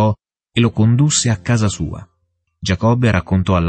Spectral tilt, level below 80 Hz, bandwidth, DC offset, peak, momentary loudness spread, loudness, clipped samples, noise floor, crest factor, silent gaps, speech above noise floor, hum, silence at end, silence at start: -5.5 dB/octave; -38 dBFS; 8.8 kHz; under 0.1%; -2 dBFS; 12 LU; -16 LUFS; under 0.1%; -68 dBFS; 14 dB; none; 53 dB; none; 0 s; 0 s